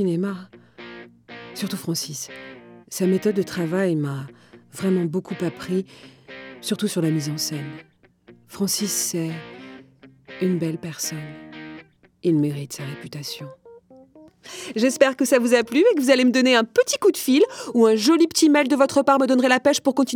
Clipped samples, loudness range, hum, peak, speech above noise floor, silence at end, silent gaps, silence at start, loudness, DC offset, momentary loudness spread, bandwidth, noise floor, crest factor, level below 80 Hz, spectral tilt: under 0.1%; 11 LU; none; -2 dBFS; 31 dB; 0 s; none; 0 s; -21 LUFS; under 0.1%; 22 LU; over 20 kHz; -52 dBFS; 20 dB; -68 dBFS; -4.5 dB/octave